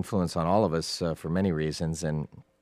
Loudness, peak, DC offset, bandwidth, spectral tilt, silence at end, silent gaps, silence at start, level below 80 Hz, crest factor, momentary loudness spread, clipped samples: -28 LUFS; -10 dBFS; under 0.1%; 15 kHz; -6 dB/octave; 0.2 s; none; 0 s; -50 dBFS; 18 dB; 7 LU; under 0.1%